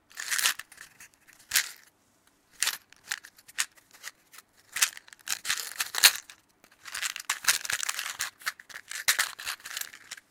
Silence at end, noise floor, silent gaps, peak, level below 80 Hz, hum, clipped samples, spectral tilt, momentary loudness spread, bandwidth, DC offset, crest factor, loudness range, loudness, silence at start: 0.15 s; -66 dBFS; none; 0 dBFS; -74 dBFS; none; under 0.1%; 3.5 dB/octave; 19 LU; 18 kHz; under 0.1%; 32 dB; 6 LU; -28 LUFS; 0.15 s